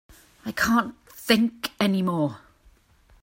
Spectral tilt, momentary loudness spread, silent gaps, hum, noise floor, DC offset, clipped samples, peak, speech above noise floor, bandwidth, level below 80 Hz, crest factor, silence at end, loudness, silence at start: -5 dB/octave; 14 LU; none; none; -58 dBFS; under 0.1%; under 0.1%; -4 dBFS; 34 dB; 16.5 kHz; -56 dBFS; 22 dB; 0.85 s; -24 LUFS; 0.45 s